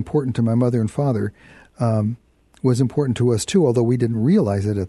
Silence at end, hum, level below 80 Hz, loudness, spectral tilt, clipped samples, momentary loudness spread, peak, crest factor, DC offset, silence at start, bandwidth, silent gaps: 0 s; none; -52 dBFS; -20 LUFS; -7.5 dB/octave; under 0.1%; 7 LU; -6 dBFS; 14 dB; under 0.1%; 0 s; 12 kHz; none